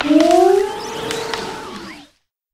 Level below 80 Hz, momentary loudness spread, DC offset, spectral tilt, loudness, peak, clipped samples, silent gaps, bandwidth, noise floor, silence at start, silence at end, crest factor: -52 dBFS; 20 LU; under 0.1%; -4 dB/octave; -16 LUFS; 0 dBFS; under 0.1%; none; 15.5 kHz; -54 dBFS; 0 s; 0.5 s; 16 dB